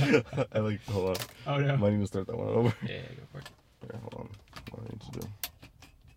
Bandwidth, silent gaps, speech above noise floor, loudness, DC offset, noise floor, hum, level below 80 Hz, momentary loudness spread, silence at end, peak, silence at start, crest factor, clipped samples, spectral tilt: 16.5 kHz; none; 25 dB; -31 LUFS; under 0.1%; -56 dBFS; none; -58 dBFS; 19 LU; 0.3 s; -10 dBFS; 0 s; 22 dB; under 0.1%; -6.5 dB/octave